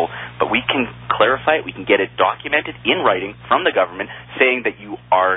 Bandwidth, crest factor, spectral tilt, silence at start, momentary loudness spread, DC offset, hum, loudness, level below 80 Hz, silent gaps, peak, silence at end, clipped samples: 4 kHz; 16 dB; -9.5 dB/octave; 0 s; 8 LU; under 0.1%; none; -18 LUFS; -52 dBFS; none; -2 dBFS; 0 s; under 0.1%